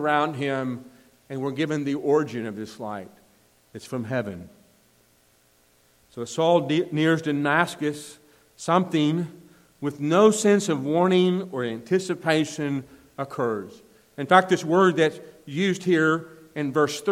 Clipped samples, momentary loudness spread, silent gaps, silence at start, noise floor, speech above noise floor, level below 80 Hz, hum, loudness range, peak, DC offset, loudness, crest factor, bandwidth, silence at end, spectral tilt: under 0.1%; 17 LU; none; 0 s; -61 dBFS; 38 dB; -70 dBFS; none; 8 LU; -2 dBFS; under 0.1%; -24 LUFS; 22 dB; 15.5 kHz; 0 s; -5.5 dB/octave